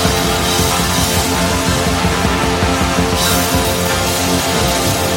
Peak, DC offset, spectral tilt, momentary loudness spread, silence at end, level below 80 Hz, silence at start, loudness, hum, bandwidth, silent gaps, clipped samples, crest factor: 0 dBFS; under 0.1%; -3.5 dB/octave; 1 LU; 0 s; -26 dBFS; 0 s; -14 LUFS; none; 17 kHz; none; under 0.1%; 14 dB